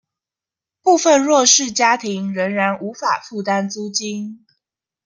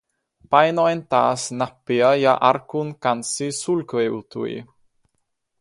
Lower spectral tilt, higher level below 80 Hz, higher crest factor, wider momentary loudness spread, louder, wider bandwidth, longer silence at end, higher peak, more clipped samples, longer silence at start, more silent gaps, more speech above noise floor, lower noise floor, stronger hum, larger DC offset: second, -2.5 dB/octave vs -4.5 dB/octave; about the same, -70 dBFS vs -66 dBFS; about the same, 18 dB vs 20 dB; about the same, 11 LU vs 12 LU; first, -17 LUFS vs -20 LUFS; about the same, 10.5 kHz vs 11.5 kHz; second, 0.7 s vs 0.95 s; about the same, 0 dBFS vs -2 dBFS; neither; first, 0.85 s vs 0.5 s; neither; first, 71 dB vs 53 dB; first, -88 dBFS vs -73 dBFS; neither; neither